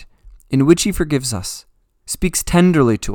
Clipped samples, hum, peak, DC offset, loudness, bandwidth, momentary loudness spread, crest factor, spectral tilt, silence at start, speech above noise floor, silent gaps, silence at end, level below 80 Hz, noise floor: under 0.1%; none; 0 dBFS; under 0.1%; -16 LUFS; 19 kHz; 13 LU; 18 dB; -5 dB/octave; 0 s; 27 dB; none; 0 s; -34 dBFS; -42 dBFS